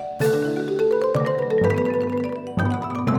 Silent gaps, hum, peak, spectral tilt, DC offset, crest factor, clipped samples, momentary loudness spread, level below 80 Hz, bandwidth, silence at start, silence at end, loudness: none; none; -8 dBFS; -7.5 dB/octave; under 0.1%; 12 dB; under 0.1%; 5 LU; -54 dBFS; 18 kHz; 0 s; 0 s; -22 LUFS